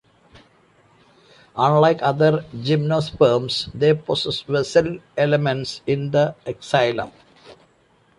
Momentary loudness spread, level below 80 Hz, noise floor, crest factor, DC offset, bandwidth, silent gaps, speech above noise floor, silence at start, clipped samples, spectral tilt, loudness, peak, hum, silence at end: 8 LU; -54 dBFS; -58 dBFS; 18 dB; under 0.1%; 11 kHz; none; 39 dB; 1.55 s; under 0.1%; -6 dB/octave; -20 LUFS; -4 dBFS; none; 0.65 s